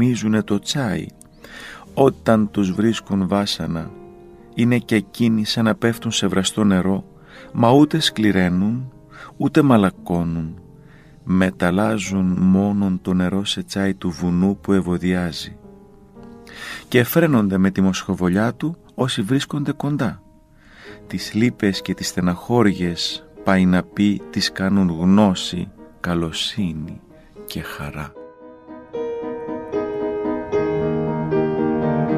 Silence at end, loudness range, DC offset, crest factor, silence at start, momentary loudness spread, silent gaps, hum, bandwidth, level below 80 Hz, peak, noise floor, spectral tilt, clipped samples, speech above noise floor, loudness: 0 s; 7 LU; under 0.1%; 20 dB; 0 s; 16 LU; none; none; 15.5 kHz; -48 dBFS; 0 dBFS; -49 dBFS; -6 dB/octave; under 0.1%; 30 dB; -20 LUFS